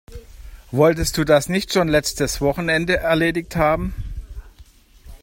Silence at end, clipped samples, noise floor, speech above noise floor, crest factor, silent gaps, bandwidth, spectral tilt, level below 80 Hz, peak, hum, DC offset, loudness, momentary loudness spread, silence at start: 0.05 s; under 0.1%; -48 dBFS; 29 dB; 18 dB; none; 16.5 kHz; -4.5 dB/octave; -34 dBFS; -2 dBFS; none; under 0.1%; -19 LUFS; 11 LU; 0.1 s